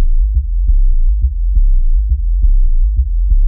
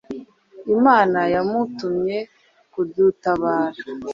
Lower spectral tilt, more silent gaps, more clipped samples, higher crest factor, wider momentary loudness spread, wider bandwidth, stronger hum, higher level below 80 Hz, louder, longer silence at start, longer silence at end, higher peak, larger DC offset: first, -18.5 dB/octave vs -7.5 dB/octave; neither; neither; second, 8 dB vs 18 dB; second, 1 LU vs 20 LU; second, 0.3 kHz vs 7.4 kHz; neither; first, -10 dBFS vs -58 dBFS; first, -17 LUFS vs -20 LUFS; about the same, 0 s vs 0.1 s; about the same, 0 s vs 0 s; about the same, -2 dBFS vs -2 dBFS; neither